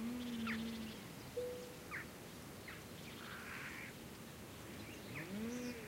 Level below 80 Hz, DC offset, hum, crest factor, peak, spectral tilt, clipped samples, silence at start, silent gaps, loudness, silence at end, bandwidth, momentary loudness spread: -66 dBFS; under 0.1%; none; 16 dB; -32 dBFS; -4.5 dB/octave; under 0.1%; 0 s; none; -48 LUFS; 0 s; 16 kHz; 9 LU